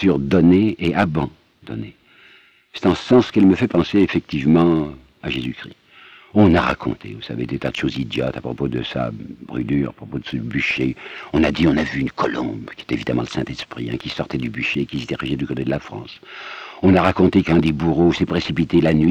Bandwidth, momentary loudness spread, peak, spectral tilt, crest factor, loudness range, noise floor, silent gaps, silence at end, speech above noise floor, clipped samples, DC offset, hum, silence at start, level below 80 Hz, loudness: 9 kHz; 17 LU; -2 dBFS; -7.5 dB/octave; 16 dB; 7 LU; -51 dBFS; none; 0 s; 32 dB; under 0.1%; under 0.1%; none; 0 s; -42 dBFS; -19 LUFS